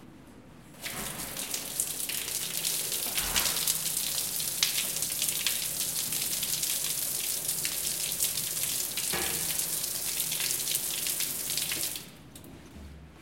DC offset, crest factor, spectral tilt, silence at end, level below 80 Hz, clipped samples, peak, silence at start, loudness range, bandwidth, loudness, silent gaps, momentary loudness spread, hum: under 0.1%; 28 dB; 0 dB/octave; 0 s; -58 dBFS; under 0.1%; -4 dBFS; 0 s; 3 LU; 17 kHz; -28 LUFS; none; 9 LU; none